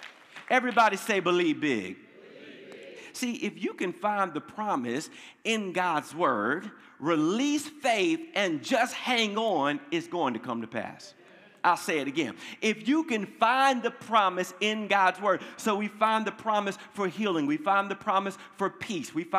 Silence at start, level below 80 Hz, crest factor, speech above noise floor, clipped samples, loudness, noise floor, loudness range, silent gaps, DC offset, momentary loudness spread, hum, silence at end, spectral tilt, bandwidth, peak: 0 s; -82 dBFS; 20 dB; 21 dB; under 0.1%; -28 LUFS; -49 dBFS; 5 LU; none; under 0.1%; 11 LU; none; 0 s; -4 dB/octave; 15.5 kHz; -8 dBFS